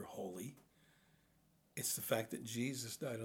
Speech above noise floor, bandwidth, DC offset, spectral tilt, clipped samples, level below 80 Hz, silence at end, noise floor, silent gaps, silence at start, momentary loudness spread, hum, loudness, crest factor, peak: 31 dB; over 20 kHz; under 0.1%; -3.5 dB/octave; under 0.1%; -82 dBFS; 0 s; -74 dBFS; none; 0 s; 12 LU; none; -42 LUFS; 24 dB; -22 dBFS